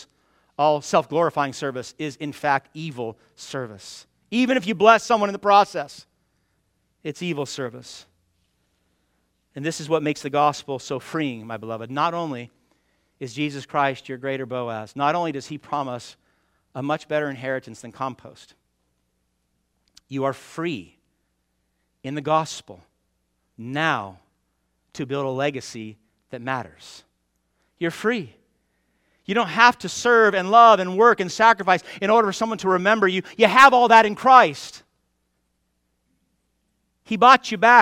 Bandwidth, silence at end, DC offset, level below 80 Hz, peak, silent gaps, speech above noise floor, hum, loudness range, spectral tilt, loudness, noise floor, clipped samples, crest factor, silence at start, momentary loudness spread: 15.5 kHz; 0 s; under 0.1%; -66 dBFS; 0 dBFS; none; 51 dB; none; 16 LU; -4.5 dB/octave; -20 LUFS; -72 dBFS; under 0.1%; 22 dB; 0 s; 21 LU